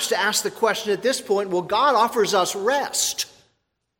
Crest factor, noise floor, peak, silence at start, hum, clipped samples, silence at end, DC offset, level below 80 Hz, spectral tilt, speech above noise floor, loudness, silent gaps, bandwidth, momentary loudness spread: 16 dB; -73 dBFS; -6 dBFS; 0 s; none; under 0.1%; 0.75 s; under 0.1%; -66 dBFS; -1.5 dB/octave; 51 dB; -21 LUFS; none; 17 kHz; 4 LU